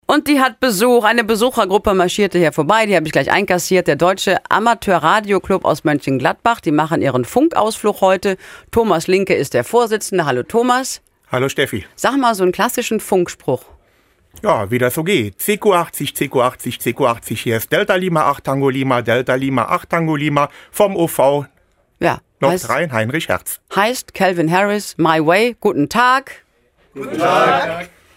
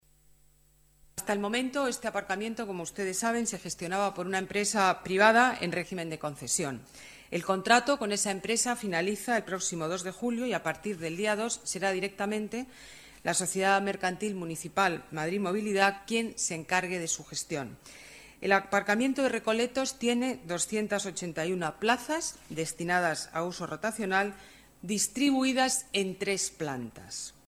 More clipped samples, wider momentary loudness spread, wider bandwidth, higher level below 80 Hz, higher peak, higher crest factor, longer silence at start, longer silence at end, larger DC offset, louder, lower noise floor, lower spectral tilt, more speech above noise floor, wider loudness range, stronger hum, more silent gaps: neither; second, 7 LU vs 11 LU; about the same, 16.5 kHz vs 16 kHz; first, -48 dBFS vs -64 dBFS; first, 0 dBFS vs -6 dBFS; second, 16 dB vs 24 dB; second, 0.1 s vs 1.15 s; about the same, 0.3 s vs 0.2 s; neither; first, -16 LUFS vs -30 LUFS; second, -57 dBFS vs -64 dBFS; first, -4.5 dB/octave vs -3 dB/octave; first, 41 dB vs 33 dB; about the same, 4 LU vs 4 LU; neither; neither